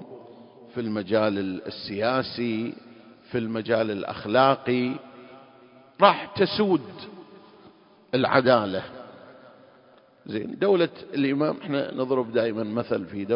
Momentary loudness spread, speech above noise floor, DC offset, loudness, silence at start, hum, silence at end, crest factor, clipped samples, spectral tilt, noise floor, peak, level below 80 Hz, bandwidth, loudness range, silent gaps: 17 LU; 31 dB; under 0.1%; -25 LUFS; 0 s; none; 0 s; 24 dB; under 0.1%; -10 dB/octave; -56 dBFS; -2 dBFS; -64 dBFS; 5.4 kHz; 4 LU; none